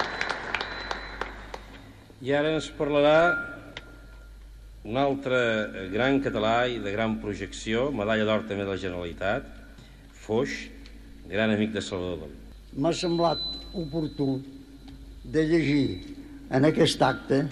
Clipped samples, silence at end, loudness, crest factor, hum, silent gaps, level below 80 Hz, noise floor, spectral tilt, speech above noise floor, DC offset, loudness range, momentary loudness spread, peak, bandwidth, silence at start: under 0.1%; 0 s; -27 LUFS; 18 dB; none; none; -48 dBFS; -48 dBFS; -5.5 dB/octave; 22 dB; under 0.1%; 4 LU; 20 LU; -8 dBFS; 12.5 kHz; 0 s